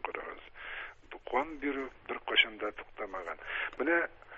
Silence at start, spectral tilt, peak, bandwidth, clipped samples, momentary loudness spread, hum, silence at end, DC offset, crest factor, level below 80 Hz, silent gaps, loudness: 0 s; 1 dB/octave; -12 dBFS; 7.8 kHz; under 0.1%; 16 LU; none; 0 s; under 0.1%; 24 dB; -62 dBFS; none; -34 LUFS